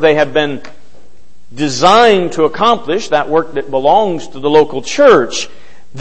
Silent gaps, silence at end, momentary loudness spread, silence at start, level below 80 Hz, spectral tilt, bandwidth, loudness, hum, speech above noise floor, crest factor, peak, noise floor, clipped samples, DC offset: none; 0 s; 11 LU; 0 s; -48 dBFS; -4 dB/octave; 8.8 kHz; -12 LUFS; none; 37 dB; 12 dB; 0 dBFS; -48 dBFS; 0.2%; 6%